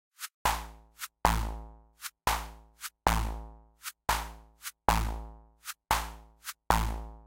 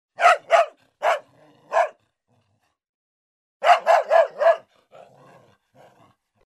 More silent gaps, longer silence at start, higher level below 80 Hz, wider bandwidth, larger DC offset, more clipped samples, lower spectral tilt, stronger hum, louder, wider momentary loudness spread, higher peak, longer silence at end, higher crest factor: second, 0.34-0.45 s vs 2.89-3.60 s; about the same, 0.2 s vs 0.2 s; first, -38 dBFS vs -80 dBFS; first, 17 kHz vs 12.5 kHz; neither; neither; first, -3.5 dB/octave vs -0.5 dB/octave; neither; second, -32 LUFS vs -20 LUFS; first, 16 LU vs 10 LU; about the same, -4 dBFS vs -2 dBFS; second, 0 s vs 1.9 s; first, 28 dB vs 20 dB